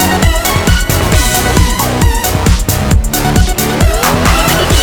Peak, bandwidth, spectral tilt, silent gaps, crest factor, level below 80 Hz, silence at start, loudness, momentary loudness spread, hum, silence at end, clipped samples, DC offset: 0 dBFS; over 20 kHz; -4 dB/octave; none; 10 dB; -14 dBFS; 0 s; -11 LUFS; 2 LU; none; 0 s; 0.2%; under 0.1%